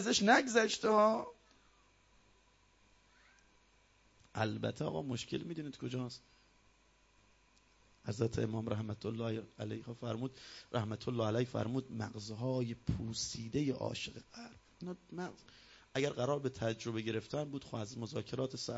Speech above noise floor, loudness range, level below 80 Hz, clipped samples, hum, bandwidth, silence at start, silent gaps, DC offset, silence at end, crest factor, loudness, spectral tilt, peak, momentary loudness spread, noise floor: 32 dB; 6 LU; -64 dBFS; under 0.1%; none; 7.6 kHz; 0 s; none; under 0.1%; 0 s; 26 dB; -38 LUFS; -4.5 dB/octave; -14 dBFS; 16 LU; -70 dBFS